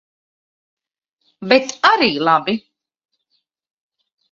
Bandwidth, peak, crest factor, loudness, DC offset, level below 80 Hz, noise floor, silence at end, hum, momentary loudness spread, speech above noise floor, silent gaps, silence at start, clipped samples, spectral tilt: 7.6 kHz; 0 dBFS; 20 dB; -15 LUFS; under 0.1%; -64 dBFS; -72 dBFS; 1.75 s; none; 12 LU; 56 dB; none; 1.4 s; under 0.1%; -3.5 dB/octave